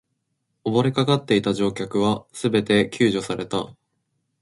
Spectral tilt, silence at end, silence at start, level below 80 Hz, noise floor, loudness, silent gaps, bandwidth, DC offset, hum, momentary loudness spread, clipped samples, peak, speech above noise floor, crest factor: -6 dB/octave; 0.7 s; 0.65 s; -56 dBFS; -75 dBFS; -22 LUFS; none; 11.5 kHz; under 0.1%; none; 8 LU; under 0.1%; -6 dBFS; 53 dB; 18 dB